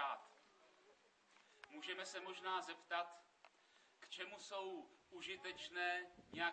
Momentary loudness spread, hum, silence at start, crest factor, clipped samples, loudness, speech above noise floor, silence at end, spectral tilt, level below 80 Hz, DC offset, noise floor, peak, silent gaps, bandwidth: 17 LU; none; 0 s; 22 dB; under 0.1%; -48 LUFS; 25 dB; 0 s; -2 dB/octave; -88 dBFS; under 0.1%; -73 dBFS; -28 dBFS; none; 8.4 kHz